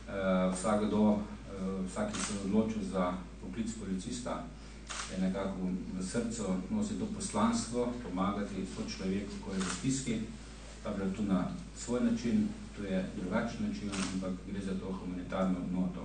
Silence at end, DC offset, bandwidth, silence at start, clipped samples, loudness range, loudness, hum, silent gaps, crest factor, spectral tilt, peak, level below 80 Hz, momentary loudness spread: 0 s; under 0.1%; 9.6 kHz; 0 s; under 0.1%; 3 LU; -35 LUFS; none; none; 18 dB; -5.5 dB/octave; -16 dBFS; -50 dBFS; 9 LU